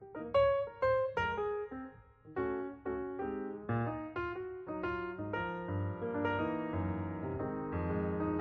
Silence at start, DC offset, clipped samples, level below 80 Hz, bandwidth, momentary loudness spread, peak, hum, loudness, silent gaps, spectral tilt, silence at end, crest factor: 0 s; under 0.1%; under 0.1%; -56 dBFS; 6.6 kHz; 9 LU; -20 dBFS; none; -37 LUFS; none; -6 dB/octave; 0 s; 16 dB